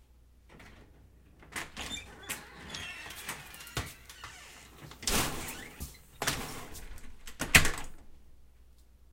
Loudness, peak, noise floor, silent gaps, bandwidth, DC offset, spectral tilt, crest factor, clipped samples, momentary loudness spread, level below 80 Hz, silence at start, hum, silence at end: -33 LUFS; -4 dBFS; -59 dBFS; none; 17 kHz; under 0.1%; -2 dB/octave; 32 dB; under 0.1%; 24 LU; -46 dBFS; 0 s; none; 0.45 s